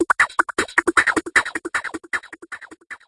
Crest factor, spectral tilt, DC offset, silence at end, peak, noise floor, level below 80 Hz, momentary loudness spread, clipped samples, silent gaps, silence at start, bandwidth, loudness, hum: 22 dB; -2 dB/octave; under 0.1%; 0.1 s; 0 dBFS; -38 dBFS; -56 dBFS; 19 LU; under 0.1%; none; 0 s; 11.5 kHz; -20 LUFS; none